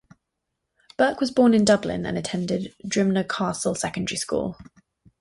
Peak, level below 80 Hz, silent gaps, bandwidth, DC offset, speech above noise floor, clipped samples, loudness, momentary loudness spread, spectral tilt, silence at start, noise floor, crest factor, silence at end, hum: -6 dBFS; -54 dBFS; none; 11.5 kHz; under 0.1%; 58 dB; under 0.1%; -23 LUFS; 10 LU; -5 dB/octave; 1 s; -80 dBFS; 18 dB; 0.6 s; none